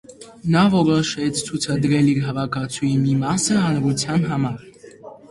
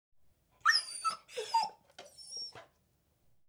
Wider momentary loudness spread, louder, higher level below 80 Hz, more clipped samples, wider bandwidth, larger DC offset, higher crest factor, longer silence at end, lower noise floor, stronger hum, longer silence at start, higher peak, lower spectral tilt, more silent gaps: second, 8 LU vs 17 LU; first, -20 LUFS vs -33 LUFS; first, -52 dBFS vs -80 dBFS; neither; second, 11.5 kHz vs 20 kHz; neither; second, 18 dB vs 24 dB; second, 0.15 s vs 0.85 s; second, -41 dBFS vs -74 dBFS; neither; second, 0.1 s vs 0.65 s; first, -2 dBFS vs -14 dBFS; first, -5.5 dB/octave vs 1.5 dB/octave; neither